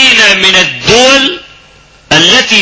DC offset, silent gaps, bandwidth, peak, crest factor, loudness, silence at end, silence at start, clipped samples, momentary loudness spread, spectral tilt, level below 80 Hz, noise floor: under 0.1%; none; 8 kHz; 0 dBFS; 8 dB; -4 LUFS; 0 s; 0 s; 4%; 7 LU; -1.5 dB/octave; -38 dBFS; -39 dBFS